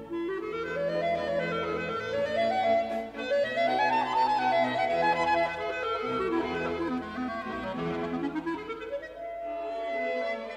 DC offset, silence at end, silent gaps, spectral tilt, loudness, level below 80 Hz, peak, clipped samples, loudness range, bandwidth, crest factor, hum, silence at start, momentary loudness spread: under 0.1%; 0 s; none; -5.5 dB/octave; -29 LUFS; -58 dBFS; -14 dBFS; under 0.1%; 7 LU; 10.5 kHz; 14 dB; none; 0 s; 9 LU